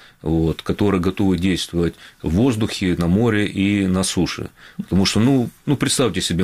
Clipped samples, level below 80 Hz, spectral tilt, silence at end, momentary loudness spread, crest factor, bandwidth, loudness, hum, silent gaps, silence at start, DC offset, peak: under 0.1%; -38 dBFS; -5.5 dB/octave; 0 s; 6 LU; 12 dB; 16 kHz; -19 LUFS; none; none; 0.25 s; 0.3%; -6 dBFS